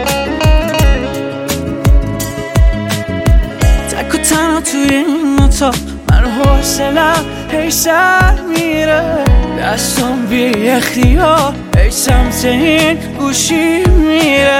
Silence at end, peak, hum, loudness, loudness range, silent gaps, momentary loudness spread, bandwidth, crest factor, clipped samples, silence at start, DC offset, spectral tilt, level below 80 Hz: 0 s; 0 dBFS; none; -12 LUFS; 3 LU; none; 6 LU; 17 kHz; 10 dB; under 0.1%; 0 s; under 0.1%; -4.5 dB/octave; -16 dBFS